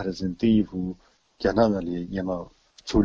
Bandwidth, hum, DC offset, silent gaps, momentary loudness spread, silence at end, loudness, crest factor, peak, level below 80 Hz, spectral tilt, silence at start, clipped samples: 7.6 kHz; none; under 0.1%; none; 15 LU; 0 s; -26 LUFS; 18 dB; -6 dBFS; -42 dBFS; -7 dB/octave; 0 s; under 0.1%